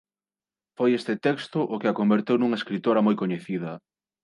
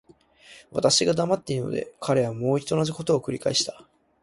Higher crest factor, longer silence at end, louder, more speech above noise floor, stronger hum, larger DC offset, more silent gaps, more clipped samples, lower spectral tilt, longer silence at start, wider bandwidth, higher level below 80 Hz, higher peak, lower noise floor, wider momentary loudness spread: about the same, 16 dB vs 20 dB; about the same, 0.45 s vs 0.5 s; about the same, -25 LUFS vs -24 LUFS; first, over 66 dB vs 28 dB; neither; neither; neither; neither; first, -7.5 dB/octave vs -4.5 dB/octave; first, 0.8 s vs 0.5 s; about the same, 11 kHz vs 11.5 kHz; second, -74 dBFS vs -60 dBFS; second, -10 dBFS vs -6 dBFS; first, under -90 dBFS vs -53 dBFS; about the same, 9 LU vs 10 LU